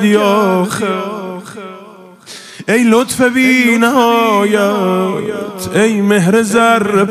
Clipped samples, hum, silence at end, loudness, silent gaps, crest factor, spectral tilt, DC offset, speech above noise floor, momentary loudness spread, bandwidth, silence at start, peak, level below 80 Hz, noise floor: under 0.1%; none; 0 s; -12 LUFS; none; 12 dB; -5 dB/octave; under 0.1%; 25 dB; 17 LU; 16 kHz; 0 s; 0 dBFS; -56 dBFS; -36 dBFS